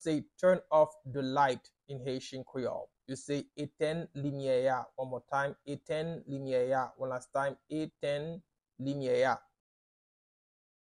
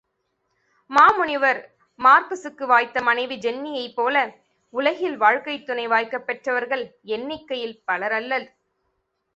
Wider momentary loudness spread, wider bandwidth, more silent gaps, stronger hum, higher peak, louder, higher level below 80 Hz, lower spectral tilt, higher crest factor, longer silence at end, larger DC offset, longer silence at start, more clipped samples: about the same, 12 LU vs 14 LU; first, 11 kHz vs 8 kHz; neither; neither; second, -14 dBFS vs -2 dBFS; second, -34 LUFS vs -21 LUFS; second, -72 dBFS vs -66 dBFS; first, -6 dB/octave vs -3.5 dB/octave; about the same, 20 dB vs 20 dB; first, 1.5 s vs 0.9 s; neither; second, 0 s vs 0.9 s; neither